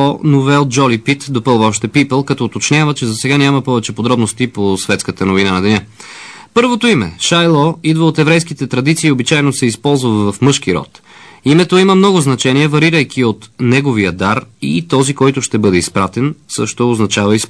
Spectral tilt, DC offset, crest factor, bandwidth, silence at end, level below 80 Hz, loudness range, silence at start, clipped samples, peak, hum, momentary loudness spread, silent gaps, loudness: -5 dB/octave; 0.2%; 12 dB; 11 kHz; 0 s; -48 dBFS; 2 LU; 0 s; under 0.1%; 0 dBFS; none; 7 LU; none; -12 LUFS